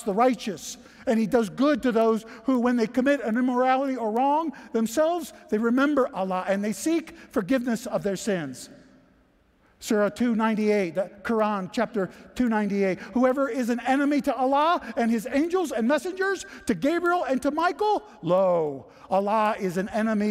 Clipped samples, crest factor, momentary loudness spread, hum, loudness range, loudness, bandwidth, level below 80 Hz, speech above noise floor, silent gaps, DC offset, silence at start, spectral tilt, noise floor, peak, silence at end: under 0.1%; 16 dB; 8 LU; none; 4 LU; -25 LUFS; 15.5 kHz; -60 dBFS; 37 dB; none; under 0.1%; 0 s; -5.5 dB/octave; -62 dBFS; -10 dBFS; 0 s